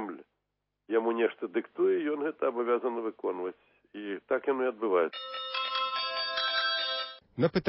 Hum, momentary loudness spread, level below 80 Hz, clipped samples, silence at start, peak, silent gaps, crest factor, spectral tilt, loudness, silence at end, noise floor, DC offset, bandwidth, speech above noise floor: none; 11 LU; -72 dBFS; under 0.1%; 0 s; -12 dBFS; none; 18 dB; -8.5 dB/octave; -31 LUFS; 0 s; -83 dBFS; under 0.1%; 5.8 kHz; 53 dB